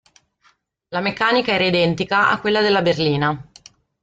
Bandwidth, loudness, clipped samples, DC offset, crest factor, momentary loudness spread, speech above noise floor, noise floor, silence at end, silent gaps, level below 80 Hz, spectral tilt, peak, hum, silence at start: 9.2 kHz; -18 LUFS; under 0.1%; under 0.1%; 16 dB; 7 LU; 42 dB; -60 dBFS; 0.6 s; none; -54 dBFS; -6 dB/octave; -4 dBFS; none; 0.9 s